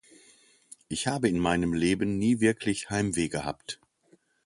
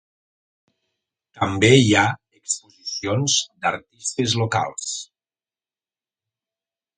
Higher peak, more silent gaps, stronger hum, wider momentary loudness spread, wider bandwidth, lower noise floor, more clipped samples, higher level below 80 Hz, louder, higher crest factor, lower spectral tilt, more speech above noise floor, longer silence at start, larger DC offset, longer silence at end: second, -10 dBFS vs 0 dBFS; neither; neither; second, 11 LU vs 14 LU; first, 11.5 kHz vs 9.6 kHz; second, -65 dBFS vs under -90 dBFS; neither; about the same, -52 dBFS vs -52 dBFS; second, -28 LUFS vs -20 LUFS; second, 18 dB vs 24 dB; about the same, -5 dB/octave vs -4 dB/octave; second, 38 dB vs over 70 dB; second, 0.9 s vs 1.35 s; neither; second, 0.7 s vs 1.95 s